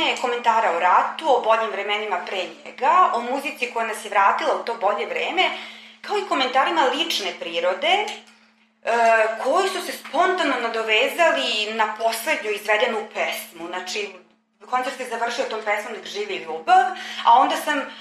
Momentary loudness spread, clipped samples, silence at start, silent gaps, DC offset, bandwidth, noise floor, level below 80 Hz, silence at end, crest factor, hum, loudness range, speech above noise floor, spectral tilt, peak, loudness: 11 LU; under 0.1%; 0 s; none; under 0.1%; 15 kHz; -57 dBFS; -82 dBFS; 0 s; 18 dB; none; 5 LU; 36 dB; -1 dB/octave; -4 dBFS; -21 LUFS